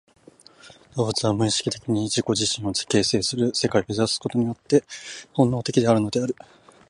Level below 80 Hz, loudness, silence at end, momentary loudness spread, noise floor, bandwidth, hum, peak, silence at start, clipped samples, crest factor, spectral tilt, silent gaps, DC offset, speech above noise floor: -54 dBFS; -23 LUFS; 0.55 s; 8 LU; -51 dBFS; 11.5 kHz; none; -4 dBFS; 0.65 s; under 0.1%; 18 dB; -4.5 dB/octave; none; under 0.1%; 28 dB